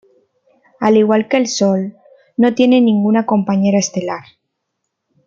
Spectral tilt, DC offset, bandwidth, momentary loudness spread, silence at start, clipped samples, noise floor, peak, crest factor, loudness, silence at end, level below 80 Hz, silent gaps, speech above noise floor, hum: -5.5 dB/octave; under 0.1%; 7.6 kHz; 12 LU; 0.8 s; under 0.1%; -74 dBFS; -2 dBFS; 14 dB; -14 LUFS; 1.05 s; -62 dBFS; none; 61 dB; none